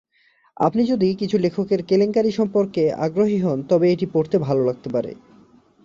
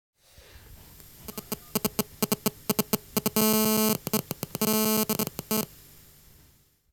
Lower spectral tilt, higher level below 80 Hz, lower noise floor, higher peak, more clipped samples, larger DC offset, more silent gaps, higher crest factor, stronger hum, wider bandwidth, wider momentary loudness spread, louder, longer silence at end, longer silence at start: first, -8 dB/octave vs -3.5 dB/octave; about the same, -60 dBFS vs -56 dBFS; about the same, -60 dBFS vs -61 dBFS; about the same, -4 dBFS vs -6 dBFS; neither; neither; neither; second, 16 dB vs 24 dB; neither; second, 7.4 kHz vs over 20 kHz; second, 5 LU vs 14 LU; first, -20 LUFS vs -27 LUFS; second, 0.7 s vs 1.25 s; about the same, 0.6 s vs 0.7 s